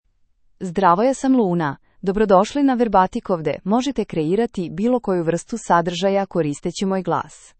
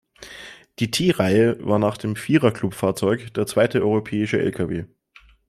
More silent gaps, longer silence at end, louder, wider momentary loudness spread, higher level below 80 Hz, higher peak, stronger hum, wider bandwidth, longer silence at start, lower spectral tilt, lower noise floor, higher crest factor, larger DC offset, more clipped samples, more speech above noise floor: neither; second, 0.25 s vs 0.6 s; about the same, -20 LUFS vs -21 LUFS; second, 8 LU vs 19 LU; first, -48 dBFS vs -56 dBFS; about the same, -2 dBFS vs -4 dBFS; neither; second, 8.8 kHz vs 15 kHz; first, 0.6 s vs 0.2 s; about the same, -6 dB/octave vs -6 dB/octave; first, -59 dBFS vs -53 dBFS; about the same, 18 dB vs 18 dB; neither; neither; first, 39 dB vs 32 dB